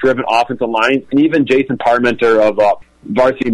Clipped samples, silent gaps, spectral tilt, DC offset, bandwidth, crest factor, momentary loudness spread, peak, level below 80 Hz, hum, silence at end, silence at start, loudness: under 0.1%; none; -6 dB/octave; under 0.1%; 11.5 kHz; 10 dB; 3 LU; -2 dBFS; -48 dBFS; none; 0 s; 0 s; -13 LUFS